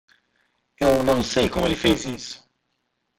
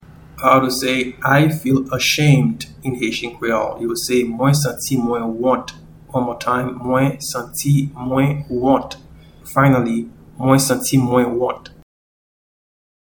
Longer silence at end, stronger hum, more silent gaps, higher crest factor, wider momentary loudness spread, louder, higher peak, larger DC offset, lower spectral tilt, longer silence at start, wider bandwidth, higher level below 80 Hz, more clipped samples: second, 0.85 s vs 1.45 s; neither; neither; about the same, 18 dB vs 18 dB; first, 15 LU vs 9 LU; second, -21 LUFS vs -18 LUFS; second, -6 dBFS vs 0 dBFS; neither; about the same, -4.5 dB/octave vs -5.5 dB/octave; first, 0.8 s vs 0.1 s; second, 16.5 kHz vs 19.5 kHz; about the same, -42 dBFS vs -46 dBFS; neither